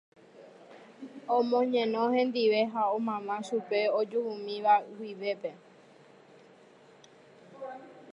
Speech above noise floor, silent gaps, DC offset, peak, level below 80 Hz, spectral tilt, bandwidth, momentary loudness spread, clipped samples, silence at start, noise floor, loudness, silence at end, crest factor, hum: 28 dB; none; under 0.1%; -12 dBFS; -88 dBFS; -5.5 dB/octave; 10.5 kHz; 18 LU; under 0.1%; 0.35 s; -57 dBFS; -29 LUFS; 0 s; 18 dB; none